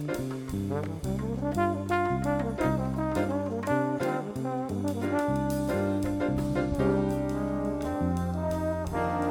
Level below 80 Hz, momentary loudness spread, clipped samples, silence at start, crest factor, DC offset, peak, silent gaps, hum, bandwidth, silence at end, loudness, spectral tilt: -44 dBFS; 5 LU; under 0.1%; 0 s; 16 dB; under 0.1%; -12 dBFS; none; none; 18.5 kHz; 0 s; -29 LUFS; -7.5 dB/octave